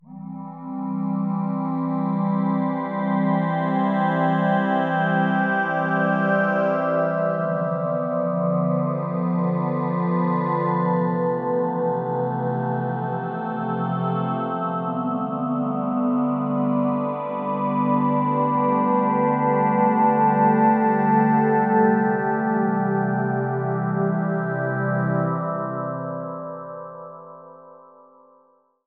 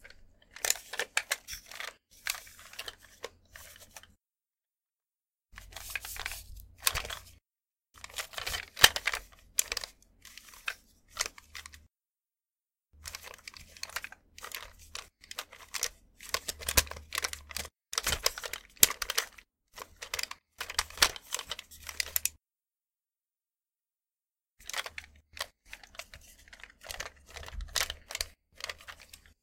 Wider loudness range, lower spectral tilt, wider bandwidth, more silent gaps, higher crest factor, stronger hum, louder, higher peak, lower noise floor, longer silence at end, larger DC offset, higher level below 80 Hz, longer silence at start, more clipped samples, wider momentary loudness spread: second, 6 LU vs 14 LU; first, -11 dB/octave vs 0.5 dB/octave; second, 4.2 kHz vs 17 kHz; neither; second, 16 dB vs 38 dB; neither; first, -22 LUFS vs -33 LUFS; second, -6 dBFS vs 0 dBFS; second, -60 dBFS vs under -90 dBFS; first, 1.1 s vs 0.25 s; neither; second, under -90 dBFS vs -54 dBFS; about the same, 0.05 s vs 0 s; neither; second, 9 LU vs 22 LU